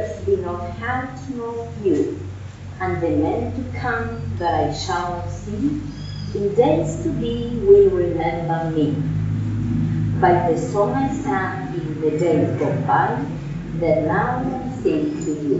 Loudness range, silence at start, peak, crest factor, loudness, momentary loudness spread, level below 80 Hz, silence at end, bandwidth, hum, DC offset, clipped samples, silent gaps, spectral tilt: 5 LU; 0 s; -2 dBFS; 18 dB; -21 LUFS; 11 LU; -40 dBFS; 0 s; 8 kHz; none; under 0.1%; under 0.1%; none; -6.5 dB/octave